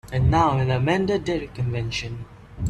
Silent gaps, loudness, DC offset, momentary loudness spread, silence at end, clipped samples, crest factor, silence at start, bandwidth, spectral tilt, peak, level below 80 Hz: none; -23 LUFS; under 0.1%; 14 LU; 0 s; under 0.1%; 16 dB; 0.05 s; 11 kHz; -6.5 dB/octave; -6 dBFS; -38 dBFS